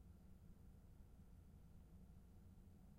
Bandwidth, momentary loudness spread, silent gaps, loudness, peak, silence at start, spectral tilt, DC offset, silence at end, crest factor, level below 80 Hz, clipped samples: 15 kHz; 1 LU; none; -67 LUFS; -52 dBFS; 0 s; -7.5 dB/octave; under 0.1%; 0 s; 12 dB; -66 dBFS; under 0.1%